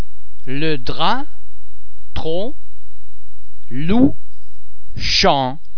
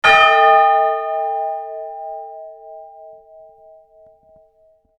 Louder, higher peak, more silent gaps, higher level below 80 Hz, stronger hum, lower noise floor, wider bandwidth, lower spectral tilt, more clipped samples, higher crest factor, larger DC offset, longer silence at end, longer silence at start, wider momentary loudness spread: second, -18 LUFS vs -14 LUFS; about the same, 0 dBFS vs 0 dBFS; neither; first, -36 dBFS vs -58 dBFS; neither; second, -49 dBFS vs -56 dBFS; second, 5.4 kHz vs 10 kHz; first, -5 dB/octave vs -1.5 dB/octave; neither; about the same, 20 dB vs 18 dB; first, 40% vs under 0.1%; second, 0 s vs 1.9 s; about the same, 0 s vs 0.05 s; second, 22 LU vs 27 LU